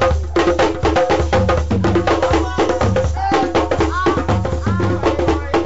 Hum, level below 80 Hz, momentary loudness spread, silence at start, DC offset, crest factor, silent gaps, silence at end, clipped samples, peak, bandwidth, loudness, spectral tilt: none; -26 dBFS; 3 LU; 0 s; 2%; 8 dB; none; 0 s; under 0.1%; -6 dBFS; 8 kHz; -17 LUFS; -5.5 dB/octave